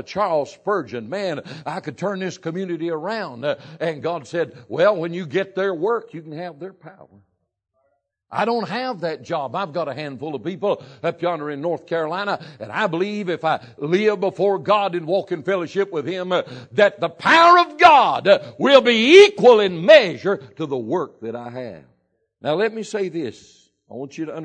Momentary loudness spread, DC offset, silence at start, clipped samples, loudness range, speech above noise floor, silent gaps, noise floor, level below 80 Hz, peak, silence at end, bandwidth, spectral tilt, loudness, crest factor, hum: 18 LU; under 0.1%; 0.1 s; under 0.1%; 14 LU; 50 dB; none; -70 dBFS; -70 dBFS; 0 dBFS; 0 s; 9.4 kHz; -5 dB/octave; -19 LUFS; 20 dB; none